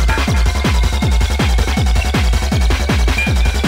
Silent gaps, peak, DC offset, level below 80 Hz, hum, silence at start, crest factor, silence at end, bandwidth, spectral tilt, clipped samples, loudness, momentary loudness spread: none; -2 dBFS; under 0.1%; -14 dBFS; none; 0 s; 10 dB; 0 s; 16 kHz; -5 dB/octave; under 0.1%; -15 LUFS; 1 LU